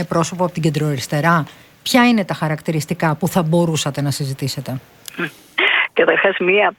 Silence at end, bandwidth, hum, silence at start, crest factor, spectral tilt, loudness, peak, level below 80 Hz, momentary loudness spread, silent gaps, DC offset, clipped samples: 0.05 s; 18 kHz; none; 0 s; 18 dB; -5 dB/octave; -17 LUFS; 0 dBFS; -54 dBFS; 12 LU; none; under 0.1%; under 0.1%